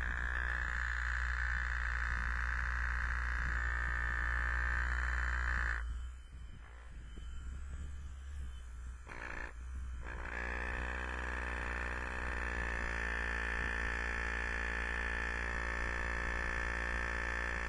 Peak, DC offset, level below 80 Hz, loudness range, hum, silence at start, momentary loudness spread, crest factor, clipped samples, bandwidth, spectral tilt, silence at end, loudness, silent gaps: -22 dBFS; under 0.1%; -40 dBFS; 11 LU; none; 0 s; 13 LU; 16 dB; under 0.1%; 10.5 kHz; -5 dB/octave; 0 s; -38 LUFS; none